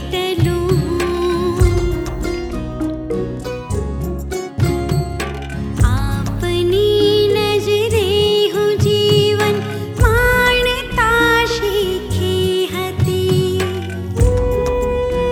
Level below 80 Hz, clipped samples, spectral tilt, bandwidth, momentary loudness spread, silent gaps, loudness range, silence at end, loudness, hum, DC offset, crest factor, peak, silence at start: -26 dBFS; under 0.1%; -5.5 dB/octave; 18 kHz; 10 LU; none; 7 LU; 0 s; -17 LUFS; none; under 0.1%; 14 dB; -2 dBFS; 0 s